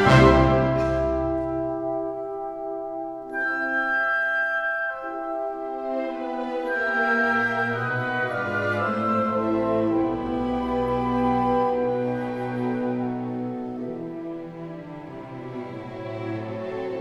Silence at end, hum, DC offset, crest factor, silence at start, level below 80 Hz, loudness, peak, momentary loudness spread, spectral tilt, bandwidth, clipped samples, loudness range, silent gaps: 0 s; none; under 0.1%; 22 dB; 0 s; -40 dBFS; -25 LUFS; -4 dBFS; 13 LU; -7 dB/octave; 11.5 kHz; under 0.1%; 7 LU; none